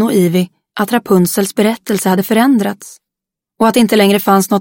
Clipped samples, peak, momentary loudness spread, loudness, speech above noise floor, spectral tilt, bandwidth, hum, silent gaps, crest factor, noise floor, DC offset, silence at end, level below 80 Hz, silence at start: under 0.1%; 0 dBFS; 8 LU; -13 LUFS; 71 dB; -5 dB/octave; 17 kHz; none; none; 12 dB; -83 dBFS; under 0.1%; 0 s; -56 dBFS; 0 s